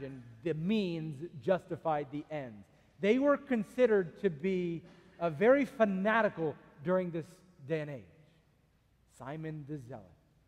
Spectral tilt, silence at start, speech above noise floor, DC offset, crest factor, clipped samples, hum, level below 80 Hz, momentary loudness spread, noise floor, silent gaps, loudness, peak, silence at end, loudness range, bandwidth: -7.5 dB/octave; 0 s; 37 dB; under 0.1%; 20 dB; under 0.1%; none; -70 dBFS; 16 LU; -69 dBFS; none; -33 LUFS; -14 dBFS; 0.45 s; 9 LU; 12.5 kHz